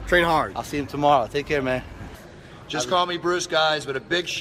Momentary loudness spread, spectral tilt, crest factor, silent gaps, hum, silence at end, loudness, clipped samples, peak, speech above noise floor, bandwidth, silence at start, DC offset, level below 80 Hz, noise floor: 20 LU; -4 dB/octave; 18 dB; none; none; 0 s; -23 LUFS; under 0.1%; -4 dBFS; 20 dB; 16 kHz; 0 s; under 0.1%; -44 dBFS; -43 dBFS